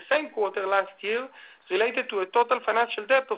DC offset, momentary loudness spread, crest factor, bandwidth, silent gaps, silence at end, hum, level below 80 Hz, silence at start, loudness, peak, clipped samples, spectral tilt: under 0.1%; 6 LU; 20 dB; 4 kHz; none; 0 s; none; -76 dBFS; 0 s; -26 LUFS; -6 dBFS; under 0.1%; -6.5 dB/octave